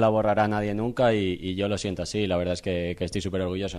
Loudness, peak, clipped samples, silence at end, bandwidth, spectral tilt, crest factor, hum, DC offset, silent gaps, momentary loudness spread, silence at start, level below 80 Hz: -26 LUFS; -10 dBFS; under 0.1%; 0 s; 13 kHz; -6 dB/octave; 16 dB; none; under 0.1%; none; 6 LU; 0 s; -50 dBFS